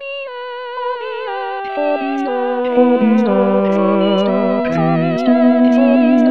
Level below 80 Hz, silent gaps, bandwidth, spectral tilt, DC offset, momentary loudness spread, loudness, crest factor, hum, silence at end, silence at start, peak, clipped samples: -60 dBFS; none; 6.4 kHz; -8.5 dB/octave; 0.8%; 12 LU; -15 LUFS; 14 dB; none; 0 s; 0 s; 0 dBFS; under 0.1%